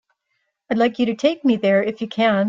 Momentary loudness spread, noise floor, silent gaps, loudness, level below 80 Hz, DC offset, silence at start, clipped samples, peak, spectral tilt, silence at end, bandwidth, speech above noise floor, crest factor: 5 LU; -73 dBFS; none; -19 LUFS; -64 dBFS; under 0.1%; 0.7 s; under 0.1%; -4 dBFS; -6.5 dB/octave; 0 s; 7.6 kHz; 55 dB; 16 dB